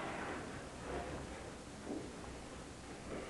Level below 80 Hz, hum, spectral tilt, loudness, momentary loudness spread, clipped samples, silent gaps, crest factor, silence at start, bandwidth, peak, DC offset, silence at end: -58 dBFS; none; -4.5 dB/octave; -47 LUFS; 6 LU; under 0.1%; none; 16 dB; 0 s; 11.5 kHz; -30 dBFS; under 0.1%; 0 s